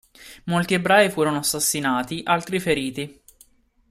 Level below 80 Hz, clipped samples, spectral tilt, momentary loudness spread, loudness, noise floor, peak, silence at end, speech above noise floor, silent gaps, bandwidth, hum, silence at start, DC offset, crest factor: -54 dBFS; under 0.1%; -3.5 dB/octave; 13 LU; -21 LUFS; -56 dBFS; -4 dBFS; 0.8 s; 35 dB; none; 16 kHz; none; 0.2 s; under 0.1%; 18 dB